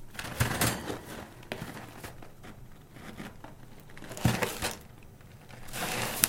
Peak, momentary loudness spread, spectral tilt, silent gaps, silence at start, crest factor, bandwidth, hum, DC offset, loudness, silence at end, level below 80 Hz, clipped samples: 0 dBFS; 22 LU; -3.5 dB/octave; none; 0 s; 36 dB; 17 kHz; none; under 0.1%; -34 LUFS; 0 s; -50 dBFS; under 0.1%